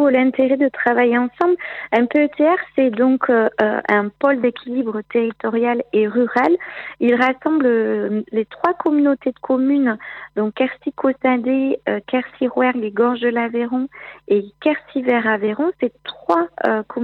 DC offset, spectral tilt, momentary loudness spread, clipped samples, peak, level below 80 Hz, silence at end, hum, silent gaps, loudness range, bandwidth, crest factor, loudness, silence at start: under 0.1%; -7.5 dB/octave; 7 LU; under 0.1%; -2 dBFS; -64 dBFS; 0 s; none; none; 3 LU; 5.6 kHz; 16 dB; -18 LUFS; 0 s